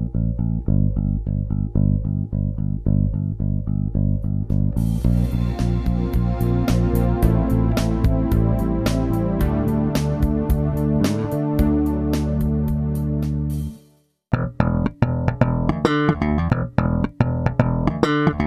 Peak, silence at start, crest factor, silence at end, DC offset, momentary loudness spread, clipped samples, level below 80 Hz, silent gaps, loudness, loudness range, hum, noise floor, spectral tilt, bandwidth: -2 dBFS; 0 s; 18 dB; 0 s; under 0.1%; 5 LU; under 0.1%; -26 dBFS; none; -21 LUFS; 3 LU; none; -56 dBFS; -8 dB/octave; 14 kHz